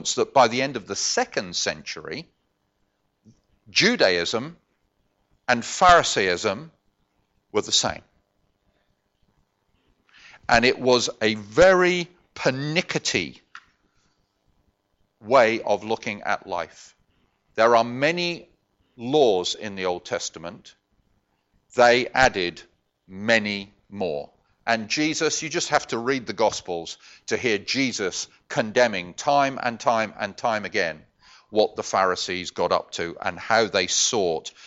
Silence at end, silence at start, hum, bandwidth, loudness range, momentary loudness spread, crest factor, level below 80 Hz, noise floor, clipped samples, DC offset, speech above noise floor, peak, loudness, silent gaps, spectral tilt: 0 s; 0 s; none; 8.2 kHz; 5 LU; 14 LU; 24 dB; -54 dBFS; -71 dBFS; under 0.1%; under 0.1%; 49 dB; 0 dBFS; -22 LUFS; none; -3 dB/octave